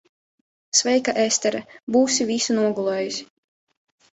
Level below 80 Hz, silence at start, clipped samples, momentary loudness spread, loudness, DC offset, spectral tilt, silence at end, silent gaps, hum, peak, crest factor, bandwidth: -66 dBFS; 0.75 s; under 0.1%; 9 LU; -21 LUFS; under 0.1%; -2.5 dB/octave; 0.9 s; 1.83-1.87 s; none; -4 dBFS; 20 dB; 8.4 kHz